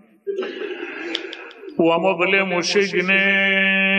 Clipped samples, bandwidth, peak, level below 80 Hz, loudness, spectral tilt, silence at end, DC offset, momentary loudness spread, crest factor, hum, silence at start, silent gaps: under 0.1%; 9 kHz; -4 dBFS; -72 dBFS; -18 LUFS; -4 dB/octave; 0 s; under 0.1%; 14 LU; 16 dB; none; 0.25 s; none